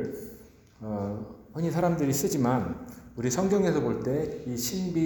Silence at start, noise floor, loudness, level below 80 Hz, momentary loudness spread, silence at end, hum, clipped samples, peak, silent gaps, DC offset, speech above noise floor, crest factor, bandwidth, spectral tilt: 0 s; -51 dBFS; -28 LUFS; -54 dBFS; 15 LU; 0 s; none; under 0.1%; -12 dBFS; none; under 0.1%; 23 dB; 16 dB; over 20 kHz; -6 dB/octave